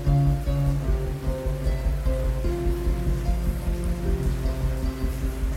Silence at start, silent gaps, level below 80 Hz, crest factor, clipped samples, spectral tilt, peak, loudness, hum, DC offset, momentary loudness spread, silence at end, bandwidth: 0 s; none; -26 dBFS; 14 dB; under 0.1%; -7.5 dB/octave; -10 dBFS; -27 LUFS; none; under 0.1%; 5 LU; 0 s; 15.5 kHz